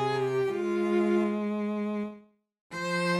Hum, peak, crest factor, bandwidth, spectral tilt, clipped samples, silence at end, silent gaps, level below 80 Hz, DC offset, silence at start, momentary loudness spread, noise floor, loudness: none; -16 dBFS; 14 dB; 12.5 kHz; -6.5 dB/octave; under 0.1%; 0 s; 2.61-2.70 s; -72 dBFS; under 0.1%; 0 s; 10 LU; -53 dBFS; -29 LUFS